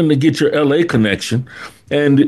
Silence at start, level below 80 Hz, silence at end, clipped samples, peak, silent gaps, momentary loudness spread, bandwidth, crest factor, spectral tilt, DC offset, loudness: 0 s; -52 dBFS; 0 s; under 0.1%; 0 dBFS; none; 10 LU; 12.5 kHz; 14 dB; -6.5 dB/octave; under 0.1%; -15 LUFS